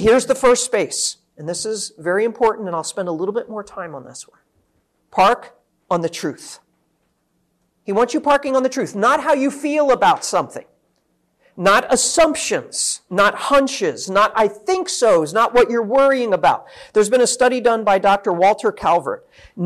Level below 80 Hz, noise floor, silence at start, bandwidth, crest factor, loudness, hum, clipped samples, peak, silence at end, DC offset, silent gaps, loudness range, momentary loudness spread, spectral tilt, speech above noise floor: -50 dBFS; -66 dBFS; 0 s; 13.5 kHz; 12 dB; -17 LUFS; none; under 0.1%; -6 dBFS; 0 s; under 0.1%; none; 7 LU; 13 LU; -3 dB/octave; 49 dB